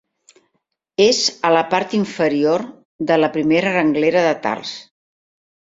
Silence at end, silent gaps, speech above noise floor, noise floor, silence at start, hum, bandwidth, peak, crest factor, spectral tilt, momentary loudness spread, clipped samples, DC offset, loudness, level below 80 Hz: 0.8 s; 2.85-2.99 s; 55 dB; -72 dBFS; 1 s; none; 7.8 kHz; -2 dBFS; 18 dB; -4 dB/octave; 12 LU; under 0.1%; under 0.1%; -17 LUFS; -62 dBFS